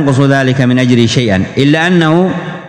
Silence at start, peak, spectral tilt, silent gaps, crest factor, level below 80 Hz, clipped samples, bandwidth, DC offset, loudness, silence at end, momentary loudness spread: 0 s; 0 dBFS; -6 dB/octave; none; 10 dB; -46 dBFS; 1%; 11 kHz; under 0.1%; -10 LUFS; 0 s; 3 LU